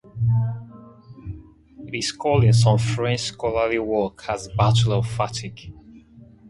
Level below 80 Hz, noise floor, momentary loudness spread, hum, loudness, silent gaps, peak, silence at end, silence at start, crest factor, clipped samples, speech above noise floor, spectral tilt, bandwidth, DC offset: -44 dBFS; -48 dBFS; 21 LU; none; -22 LUFS; none; -4 dBFS; 0.25 s; 0.15 s; 18 dB; under 0.1%; 27 dB; -5.5 dB/octave; 11.5 kHz; under 0.1%